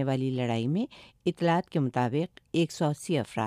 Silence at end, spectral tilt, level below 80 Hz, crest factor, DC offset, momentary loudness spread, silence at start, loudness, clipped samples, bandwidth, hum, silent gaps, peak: 0 s; -6.5 dB/octave; -68 dBFS; 14 dB; under 0.1%; 6 LU; 0 s; -29 LUFS; under 0.1%; 13.5 kHz; none; none; -14 dBFS